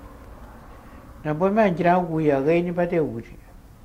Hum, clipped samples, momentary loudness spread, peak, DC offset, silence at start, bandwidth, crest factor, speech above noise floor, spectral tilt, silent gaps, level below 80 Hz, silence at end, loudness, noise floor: none; under 0.1%; 10 LU; -6 dBFS; under 0.1%; 0 s; 15 kHz; 18 dB; 22 dB; -8.5 dB/octave; none; -46 dBFS; 0.2 s; -22 LUFS; -43 dBFS